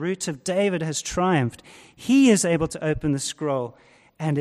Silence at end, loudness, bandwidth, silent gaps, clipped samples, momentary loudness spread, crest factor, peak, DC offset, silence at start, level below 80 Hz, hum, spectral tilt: 0 s; -23 LUFS; 13.5 kHz; none; under 0.1%; 12 LU; 16 dB; -6 dBFS; under 0.1%; 0 s; -48 dBFS; none; -5 dB/octave